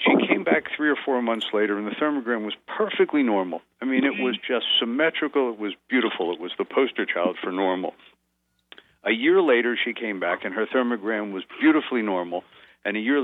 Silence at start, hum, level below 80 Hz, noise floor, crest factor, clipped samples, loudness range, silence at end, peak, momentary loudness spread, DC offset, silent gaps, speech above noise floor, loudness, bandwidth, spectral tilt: 0 s; none; -76 dBFS; -72 dBFS; 18 dB; under 0.1%; 3 LU; 0 s; -6 dBFS; 9 LU; under 0.1%; none; 49 dB; -24 LUFS; 4.1 kHz; -6.5 dB/octave